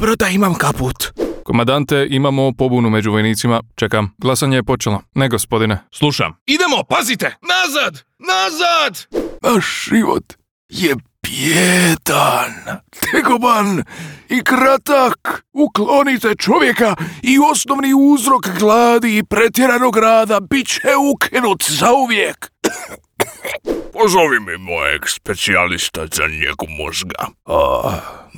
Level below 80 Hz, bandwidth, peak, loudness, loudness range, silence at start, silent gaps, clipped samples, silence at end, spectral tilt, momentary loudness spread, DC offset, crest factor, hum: -42 dBFS; over 20 kHz; 0 dBFS; -15 LUFS; 4 LU; 0 s; 6.41-6.46 s, 10.51-10.69 s; under 0.1%; 0 s; -4 dB/octave; 10 LU; under 0.1%; 14 dB; none